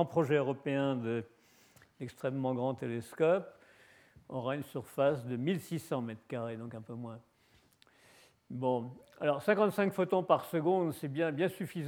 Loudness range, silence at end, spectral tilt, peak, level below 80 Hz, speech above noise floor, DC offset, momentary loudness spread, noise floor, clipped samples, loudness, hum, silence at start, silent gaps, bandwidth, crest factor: 8 LU; 0 s; -7 dB/octave; -12 dBFS; -76 dBFS; 35 dB; under 0.1%; 15 LU; -68 dBFS; under 0.1%; -34 LUFS; none; 0 s; none; over 20 kHz; 22 dB